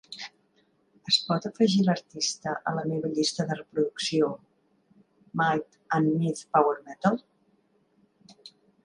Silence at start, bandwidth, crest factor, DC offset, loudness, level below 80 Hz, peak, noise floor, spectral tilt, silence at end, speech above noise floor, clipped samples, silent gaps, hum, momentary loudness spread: 0.1 s; 11 kHz; 20 dB; under 0.1%; -27 LUFS; -70 dBFS; -8 dBFS; -67 dBFS; -4.5 dB/octave; 0.35 s; 41 dB; under 0.1%; none; none; 11 LU